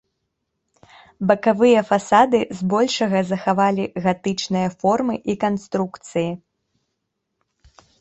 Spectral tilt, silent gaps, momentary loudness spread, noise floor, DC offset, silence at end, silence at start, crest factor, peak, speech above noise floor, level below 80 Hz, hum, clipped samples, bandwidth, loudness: -5.5 dB/octave; none; 10 LU; -77 dBFS; under 0.1%; 1.65 s; 1.2 s; 20 dB; -2 dBFS; 58 dB; -60 dBFS; none; under 0.1%; 8.2 kHz; -20 LUFS